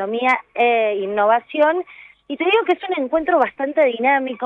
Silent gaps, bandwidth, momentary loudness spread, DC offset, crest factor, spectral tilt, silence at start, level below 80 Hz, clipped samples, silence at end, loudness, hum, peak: none; 7 kHz; 5 LU; under 0.1%; 14 dB; -5.5 dB/octave; 0 s; -60 dBFS; under 0.1%; 0 s; -18 LUFS; none; -4 dBFS